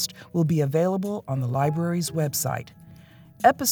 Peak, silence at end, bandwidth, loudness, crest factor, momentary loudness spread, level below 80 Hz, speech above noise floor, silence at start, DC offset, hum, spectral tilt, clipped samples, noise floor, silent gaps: -4 dBFS; 0 s; over 20 kHz; -25 LUFS; 20 dB; 7 LU; -64 dBFS; 25 dB; 0 s; under 0.1%; none; -5 dB/octave; under 0.1%; -49 dBFS; none